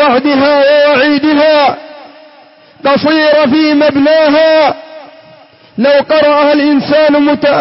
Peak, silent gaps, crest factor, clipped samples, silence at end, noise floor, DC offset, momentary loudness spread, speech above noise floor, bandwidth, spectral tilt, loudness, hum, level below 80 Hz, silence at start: 0 dBFS; none; 8 dB; under 0.1%; 0 s; -40 dBFS; under 0.1%; 6 LU; 32 dB; 5.8 kHz; -8 dB/octave; -8 LUFS; none; -50 dBFS; 0 s